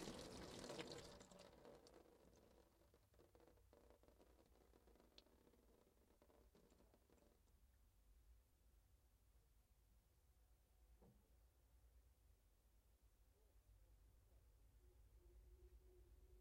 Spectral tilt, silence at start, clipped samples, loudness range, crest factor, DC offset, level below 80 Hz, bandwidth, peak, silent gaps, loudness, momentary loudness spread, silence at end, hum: -4 dB/octave; 0 s; under 0.1%; 6 LU; 32 dB; under 0.1%; -74 dBFS; 16 kHz; -36 dBFS; none; -59 LUFS; 12 LU; 0 s; none